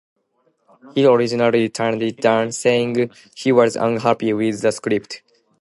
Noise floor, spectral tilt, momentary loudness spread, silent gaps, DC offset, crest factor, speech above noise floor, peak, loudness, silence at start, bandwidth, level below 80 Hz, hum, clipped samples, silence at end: -65 dBFS; -5 dB/octave; 9 LU; none; under 0.1%; 18 dB; 47 dB; 0 dBFS; -18 LUFS; 0.85 s; 11.5 kHz; -64 dBFS; none; under 0.1%; 0.45 s